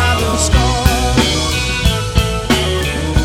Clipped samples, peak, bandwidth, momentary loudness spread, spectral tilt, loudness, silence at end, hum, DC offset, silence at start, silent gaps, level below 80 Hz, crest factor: under 0.1%; 0 dBFS; 17 kHz; 3 LU; -4 dB/octave; -14 LUFS; 0 s; none; under 0.1%; 0 s; none; -18 dBFS; 14 dB